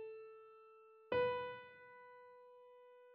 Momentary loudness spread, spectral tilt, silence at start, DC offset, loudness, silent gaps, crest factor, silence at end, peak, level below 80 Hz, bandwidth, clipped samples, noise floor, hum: 24 LU; -2.5 dB/octave; 0 s; under 0.1%; -42 LUFS; none; 20 dB; 0 s; -26 dBFS; -78 dBFS; 5.4 kHz; under 0.1%; -64 dBFS; none